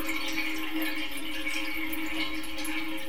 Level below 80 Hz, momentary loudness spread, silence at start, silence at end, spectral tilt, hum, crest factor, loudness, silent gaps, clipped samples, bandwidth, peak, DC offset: -54 dBFS; 3 LU; 0 s; 0 s; -2 dB/octave; none; 16 dB; -32 LUFS; none; under 0.1%; 18 kHz; -16 dBFS; 3%